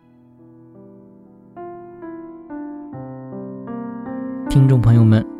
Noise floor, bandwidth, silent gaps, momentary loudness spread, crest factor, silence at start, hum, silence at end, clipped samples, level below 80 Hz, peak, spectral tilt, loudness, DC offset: -48 dBFS; 10.5 kHz; none; 23 LU; 18 dB; 0.8 s; none; 0 s; under 0.1%; -42 dBFS; -2 dBFS; -9 dB/octave; -17 LUFS; under 0.1%